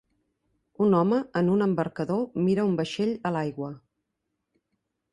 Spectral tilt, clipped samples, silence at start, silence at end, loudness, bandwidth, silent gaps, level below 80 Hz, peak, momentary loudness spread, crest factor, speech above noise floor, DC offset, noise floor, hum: -8 dB/octave; under 0.1%; 0.8 s; 1.35 s; -26 LUFS; 11 kHz; none; -66 dBFS; -10 dBFS; 7 LU; 16 dB; 56 dB; under 0.1%; -81 dBFS; none